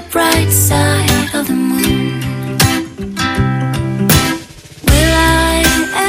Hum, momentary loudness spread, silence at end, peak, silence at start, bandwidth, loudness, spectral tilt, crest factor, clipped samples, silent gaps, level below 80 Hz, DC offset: none; 8 LU; 0 s; 0 dBFS; 0 s; 17 kHz; -13 LUFS; -4 dB/octave; 12 dB; under 0.1%; none; -24 dBFS; under 0.1%